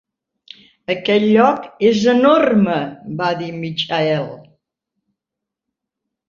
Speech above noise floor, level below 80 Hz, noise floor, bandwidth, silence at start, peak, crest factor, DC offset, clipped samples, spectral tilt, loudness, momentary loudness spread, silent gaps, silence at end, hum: 68 dB; -60 dBFS; -83 dBFS; 7.4 kHz; 0.9 s; 0 dBFS; 18 dB; under 0.1%; under 0.1%; -6 dB/octave; -16 LUFS; 12 LU; none; 1.9 s; none